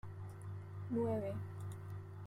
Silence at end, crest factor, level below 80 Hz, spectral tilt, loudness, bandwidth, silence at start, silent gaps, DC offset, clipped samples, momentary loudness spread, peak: 0 s; 16 dB; -68 dBFS; -9 dB/octave; -43 LUFS; 13.5 kHz; 0.05 s; none; under 0.1%; under 0.1%; 11 LU; -28 dBFS